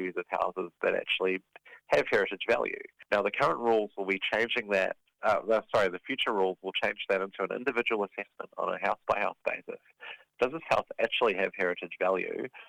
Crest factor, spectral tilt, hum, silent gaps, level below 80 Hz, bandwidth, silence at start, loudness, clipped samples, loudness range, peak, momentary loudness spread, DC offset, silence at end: 18 dB; -4.5 dB/octave; none; none; -68 dBFS; 12.5 kHz; 0 s; -30 LUFS; under 0.1%; 3 LU; -12 dBFS; 9 LU; under 0.1%; 0.05 s